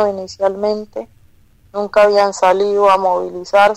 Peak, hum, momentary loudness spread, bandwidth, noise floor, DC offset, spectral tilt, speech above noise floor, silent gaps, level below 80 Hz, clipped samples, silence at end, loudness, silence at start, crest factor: -2 dBFS; none; 13 LU; 11.5 kHz; -49 dBFS; under 0.1%; -4 dB/octave; 34 dB; none; -52 dBFS; under 0.1%; 0 s; -15 LUFS; 0 s; 12 dB